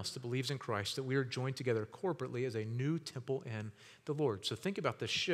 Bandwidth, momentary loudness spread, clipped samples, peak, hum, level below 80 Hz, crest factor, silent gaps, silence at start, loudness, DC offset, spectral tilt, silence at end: 15 kHz; 5 LU; under 0.1%; -18 dBFS; none; -80 dBFS; 20 dB; none; 0 s; -38 LUFS; under 0.1%; -5 dB/octave; 0 s